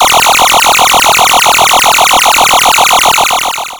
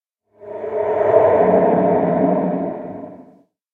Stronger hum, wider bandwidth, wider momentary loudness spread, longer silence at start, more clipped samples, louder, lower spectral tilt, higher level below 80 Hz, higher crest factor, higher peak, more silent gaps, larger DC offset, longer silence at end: neither; first, over 20 kHz vs 3.8 kHz; second, 1 LU vs 19 LU; second, 0 s vs 0.4 s; first, 4% vs under 0.1%; first, -4 LUFS vs -16 LUFS; second, 0.5 dB/octave vs -10.5 dB/octave; first, -36 dBFS vs -56 dBFS; second, 6 dB vs 18 dB; about the same, 0 dBFS vs 0 dBFS; neither; neither; second, 0 s vs 0.5 s